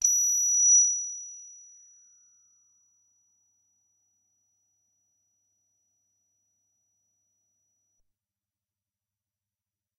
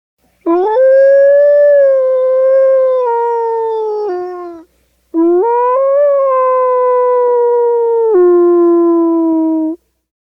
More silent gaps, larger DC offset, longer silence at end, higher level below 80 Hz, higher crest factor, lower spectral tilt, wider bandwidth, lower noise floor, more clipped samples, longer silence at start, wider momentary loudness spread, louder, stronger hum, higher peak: neither; neither; first, 8.5 s vs 0.6 s; second, -88 dBFS vs -64 dBFS; first, 22 dB vs 8 dB; second, 6 dB/octave vs -7 dB/octave; first, 12 kHz vs 5.6 kHz; first, under -90 dBFS vs -54 dBFS; neither; second, 0 s vs 0.45 s; first, 23 LU vs 10 LU; second, -20 LUFS vs -10 LUFS; neither; second, -10 dBFS vs -2 dBFS